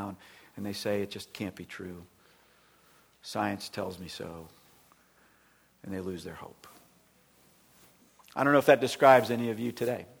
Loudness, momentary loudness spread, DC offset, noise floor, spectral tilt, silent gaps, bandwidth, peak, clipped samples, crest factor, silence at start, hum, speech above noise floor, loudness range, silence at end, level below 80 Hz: -29 LUFS; 26 LU; under 0.1%; -65 dBFS; -5 dB/octave; none; over 20 kHz; -6 dBFS; under 0.1%; 26 dB; 0 s; none; 36 dB; 19 LU; 0.15 s; -68 dBFS